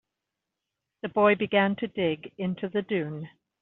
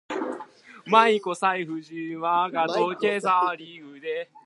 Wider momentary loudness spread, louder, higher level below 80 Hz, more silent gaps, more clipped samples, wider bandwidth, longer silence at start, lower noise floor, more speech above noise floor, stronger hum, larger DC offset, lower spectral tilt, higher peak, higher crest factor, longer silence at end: second, 15 LU vs 18 LU; second, -27 LUFS vs -24 LUFS; first, -70 dBFS vs -80 dBFS; neither; neither; second, 4.1 kHz vs 11.5 kHz; first, 1.05 s vs 0.1 s; first, -86 dBFS vs -45 dBFS; first, 59 dB vs 20 dB; neither; neither; about the same, -4.5 dB/octave vs -4.5 dB/octave; second, -8 dBFS vs -2 dBFS; about the same, 20 dB vs 22 dB; first, 0.35 s vs 0.2 s